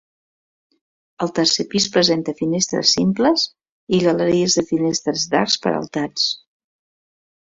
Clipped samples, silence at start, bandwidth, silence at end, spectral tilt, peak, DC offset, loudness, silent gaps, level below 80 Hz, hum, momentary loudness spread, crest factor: under 0.1%; 1.2 s; 8 kHz; 1.2 s; -3.5 dB/octave; -2 dBFS; under 0.1%; -18 LUFS; 3.69-3.87 s; -58 dBFS; none; 7 LU; 18 dB